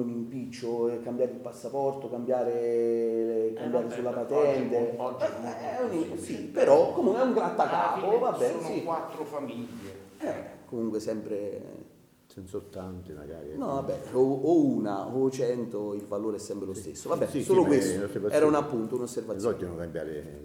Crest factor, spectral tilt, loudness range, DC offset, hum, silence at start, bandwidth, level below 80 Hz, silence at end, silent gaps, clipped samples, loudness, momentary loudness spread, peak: 22 dB; -6.5 dB/octave; 10 LU; under 0.1%; none; 0 s; 17 kHz; -64 dBFS; 0 s; none; under 0.1%; -29 LUFS; 15 LU; -6 dBFS